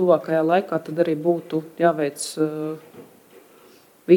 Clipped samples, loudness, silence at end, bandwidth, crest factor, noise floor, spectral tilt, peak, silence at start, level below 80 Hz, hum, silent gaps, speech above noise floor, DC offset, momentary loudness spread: under 0.1%; -22 LUFS; 0 s; 18.5 kHz; 20 dB; -52 dBFS; -6 dB/octave; -2 dBFS; 0 s; -78 dBFS; none; none; 30 dB; under 0.1%; 11 LU